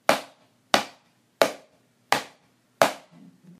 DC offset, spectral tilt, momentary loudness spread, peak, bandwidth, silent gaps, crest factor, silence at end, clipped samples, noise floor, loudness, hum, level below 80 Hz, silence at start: under 0.1%; -2 dB/octave; 18 LU; 0 dBFS; 15.5 kHz; none; 28 dB; 0.6 s; under 0.1%; -62 dBFS; -25 LUFS; none; -72 dBFS; 0.1 s